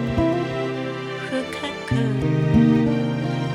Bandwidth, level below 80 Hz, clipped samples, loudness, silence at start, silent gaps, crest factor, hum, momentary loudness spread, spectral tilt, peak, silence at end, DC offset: 11 kHz; -40 dBFS; under 0.1%; -22 LUFS; 0 s; none; 16 dB; none; 11 LU; -7.5 dB/octave; -6 dBFS; 0 s; under 0.1%